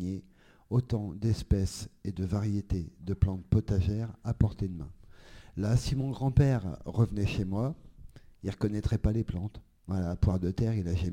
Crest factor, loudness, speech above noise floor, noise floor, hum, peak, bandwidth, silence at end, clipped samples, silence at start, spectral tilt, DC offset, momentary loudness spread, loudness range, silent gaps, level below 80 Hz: 20 dB; -31 LUFS; 29 dB; -59 dBFS; none; -10 dBFS; 11.5 kHz; 0 s; under 0.1%; 0 s; -7.5 dB/octave; under 0.1%; 11 LU; 2 LU; none; -40 dBFS